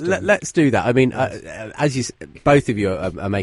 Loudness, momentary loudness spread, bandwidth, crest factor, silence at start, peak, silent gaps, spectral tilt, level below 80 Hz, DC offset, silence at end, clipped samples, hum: -19 LUFS; 9 LU; 11.5 kHz; 18 dB; 0 s; -2 dBFS; none; -6 dB/octave; -44 dBFS; under 0.1%; 0 s; under 0.1%; none